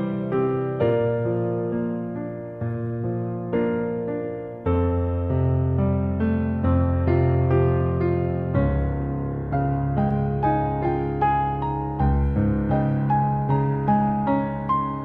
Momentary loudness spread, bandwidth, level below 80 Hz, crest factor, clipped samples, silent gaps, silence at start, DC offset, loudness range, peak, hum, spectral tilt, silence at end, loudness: 7 LU; 4.2 kHz; -34 dBFS; 14 dB; under 0.1%; none; 0 s; under 0.1%; 4 LU; -8 dBFS; none; -12 dB/octave; 0 s; -23 LUFS